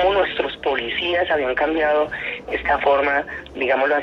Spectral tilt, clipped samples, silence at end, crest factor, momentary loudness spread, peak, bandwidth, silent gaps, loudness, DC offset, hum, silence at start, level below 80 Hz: -5.5 dB/octave; under 0.1%; 0 s; 14 dB; 7 LU; -6 dBFS; 6.4 kHz; none; -20 LUFS; under 0.1%; none; 0 s; -46 dBFS